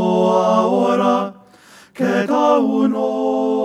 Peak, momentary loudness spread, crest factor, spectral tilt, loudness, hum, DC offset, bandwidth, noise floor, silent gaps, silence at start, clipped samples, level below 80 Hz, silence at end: -2 dBFS; 5 LU; 16 dB; -6.5 dB/octave; -16 LUFS; none; under 0.1%; 12 kHz; -46 dBFS; none; 0 s; under 0.1%; -74 dBFS; 0 s